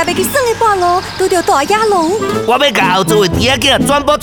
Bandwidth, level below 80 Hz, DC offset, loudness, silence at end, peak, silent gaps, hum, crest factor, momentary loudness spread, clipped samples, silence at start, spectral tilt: over 20 kHz; -34 dBFS; 0.5%; -11 LUFS; 0 s; 0 dBFS; none; none; 12 dB; 4 LU; under 0.1%; 0 s; -3.5 dB/octave